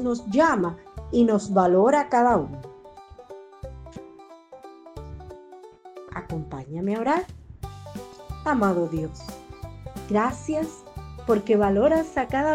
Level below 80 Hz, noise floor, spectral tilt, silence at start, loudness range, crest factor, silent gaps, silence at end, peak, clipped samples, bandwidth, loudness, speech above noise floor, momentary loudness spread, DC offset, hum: -46 dBFS; -47 dBFS; -7 dB/octave; 0 s; 18 LU; 18 dB; none; 0 s; -8 dBFS; under 0.1%; 16 kHz; -23 LUFS; 25 dB; 24 LU; under 0.1%; none